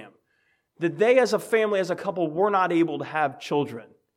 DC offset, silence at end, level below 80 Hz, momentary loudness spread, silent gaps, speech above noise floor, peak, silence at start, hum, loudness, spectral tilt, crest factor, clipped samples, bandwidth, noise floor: under 0.1%; 0.3 s; -80 dBFS; 9 LU; none; 46 dB; -6 dBFS; 0 s; none; -24 LUFS; -5.5 dB/octave; 18 dB; under 0.1%; 15.5 kHz; -70 dBFS